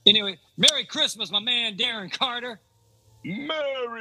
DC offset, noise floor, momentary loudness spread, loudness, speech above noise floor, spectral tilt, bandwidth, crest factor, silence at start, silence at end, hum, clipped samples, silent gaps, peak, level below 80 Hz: under 0.1%; -59 dBFS; 15 LU; -23 LUFS; 34 dB; -1.5 dB/octave; 15.5 kHz; 26 dB; 0.05 s; 0 s; none; under 0.1%; none; 0 dBFS; -72 dBFS